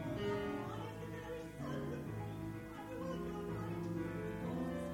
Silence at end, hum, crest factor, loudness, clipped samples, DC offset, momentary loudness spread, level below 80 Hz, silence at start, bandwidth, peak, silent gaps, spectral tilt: 0 s; none; 14 dB; -43 LUFS; under 0.1%; under 0.1%; 6 LU; -60 dBFS; 0 s; 17.5 kHz; -28 dBFS; none; -7 dB/octave